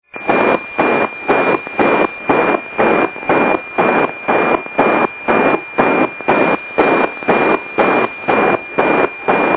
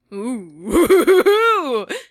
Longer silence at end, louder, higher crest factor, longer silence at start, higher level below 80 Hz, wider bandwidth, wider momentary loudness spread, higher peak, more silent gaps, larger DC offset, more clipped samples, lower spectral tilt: about the same, 0 s vs 0.1 s; about the same, -14 LUFS vs -15 LUFS; about the same, 14 dB vs 14 dB; about the same, 0.15 s vs 0.1 s; second, -50 dBFS vs -44 dBFS; second, 4 kHz vs 15.5 kHz; second, 2 LU vs 15 LU; about the same, 0 dBFS vs -2 dBFS; neither; first, 0.1% vs under 0.1%; neither; first, -9.5 dB/octave vs -4 dB/octave